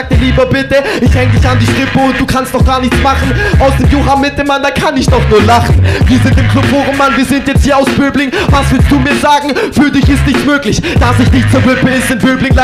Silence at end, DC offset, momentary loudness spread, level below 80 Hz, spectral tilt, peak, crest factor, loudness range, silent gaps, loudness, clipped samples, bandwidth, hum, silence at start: 0 s; under 0.1%; 3 LU; -16 dBFS; -6 dB/octave; 0 dBFS; 8 dB; 1 LU; none; -9 LUFS; under 0.1%; 15 kHz; none; 0 s